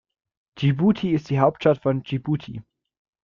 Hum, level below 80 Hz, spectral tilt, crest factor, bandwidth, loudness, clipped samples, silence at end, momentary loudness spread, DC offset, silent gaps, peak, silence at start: none; -56 dBFS; -9 dB/octave; 20 dB; 7 kHz; -22 LUFS; under 0.1%; 0.65 s; 9 LU; under 0.1%; none; -4 dBFS; 0.55 s